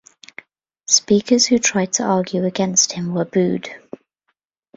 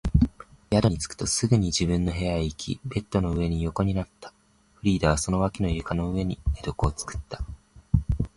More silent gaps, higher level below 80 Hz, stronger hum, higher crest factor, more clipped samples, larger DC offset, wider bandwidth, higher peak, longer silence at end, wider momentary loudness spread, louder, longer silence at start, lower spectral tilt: neither; second, -60 dBFS vs -34 dBFS; neither; about the same, 18 dB vs 20 dB; neither; neither; second, 8 kHz vs 11.5 kHz; first, -2 dBFS vs -6 dBFS; first, 1 s vs 0.1 s; about the same, 12 LU vs 10 LU; first, -17 LUFS vs -26 LUFS; first, 0.9 s vs 0.05 s; second, -3 dB/octave vs -5.5 dB/octave